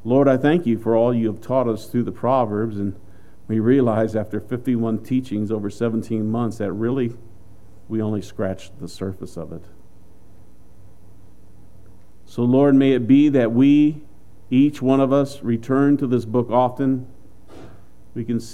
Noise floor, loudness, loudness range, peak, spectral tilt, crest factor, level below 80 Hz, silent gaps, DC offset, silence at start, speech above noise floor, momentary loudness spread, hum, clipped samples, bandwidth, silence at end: -50 dBFS; -20 LUFS; 13 LU; -4 dBFS; -8.5 dB/octave; 18 dB; -54 dBFS; none; 2%; 0.05 s; 31 dB; 15 LU; none; under 0.1%; 12 kHz; 0 s